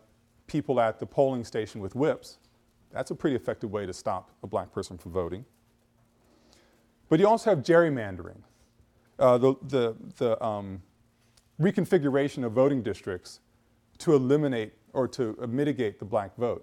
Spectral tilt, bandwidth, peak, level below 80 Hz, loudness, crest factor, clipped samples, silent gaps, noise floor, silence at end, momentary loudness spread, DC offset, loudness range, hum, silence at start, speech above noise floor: -7 dB/octave; 13.5 kHz; -10 dBFS; -62 dBFS; -27 LUFS; 20 dB; under 0.1%; none; -65 dBFS; 0 s; 14 LU; under 0.1%; 8 LU; none; 0.5 s; 39 dB